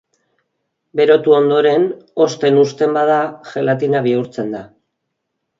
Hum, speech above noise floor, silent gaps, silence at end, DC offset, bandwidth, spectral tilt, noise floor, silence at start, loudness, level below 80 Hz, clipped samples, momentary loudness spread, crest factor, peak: none; 60 dB; none; 0.95 s; under 0.1%; 7.6 kHz; -6 dB/octave; -74 dBFS; 0.95 s; -15 LUFS; -64 dBFS; under 0.1%; 12 LU; 16 dB; 0 dBFS